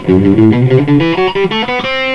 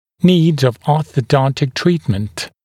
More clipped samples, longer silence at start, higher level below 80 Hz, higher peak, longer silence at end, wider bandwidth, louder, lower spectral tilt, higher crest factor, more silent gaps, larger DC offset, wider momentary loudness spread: first, 0.9% vs under 0.1%; second, 0 s vs 0.25 s; first, -38 dBFS vs -48 dBFS; about the same, 0 dBFS vs 0 dBFS; second, 0 s vs 0.15 s; second, 8 kHz vs 13.5 kHz; first, -10 LUFS vs -16 LUFS; about the same, -8 dB/octave vs -7 dB/octave; second, 10 dB vs 16 dB; neither; neither; second, 5 LU vs 8 LU